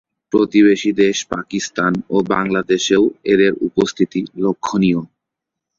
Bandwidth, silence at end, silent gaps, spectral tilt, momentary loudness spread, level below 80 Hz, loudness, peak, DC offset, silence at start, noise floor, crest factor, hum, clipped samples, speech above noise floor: 7.6 kHz; 0.75 s; none; -5 dB/octave; 8 LU; -52 dBFS; -17 LUFS; -2 dBFS; under 0.1%; 0.35 s; -82 dBFS; 16 dB; none; under 0.1%; 66 dB